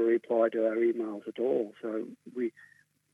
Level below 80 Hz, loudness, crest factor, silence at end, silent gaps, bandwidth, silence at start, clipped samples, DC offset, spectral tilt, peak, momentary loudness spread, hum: under -90 dBFS; -31 LUFS; 16 dB; 0.65 s; none; 3.7 kHz; 0 s; under 0.1%; under 0.1%; -7.5 dB/octave; -14 dBFS; 10 LU; 50 Hz at -80 dBFS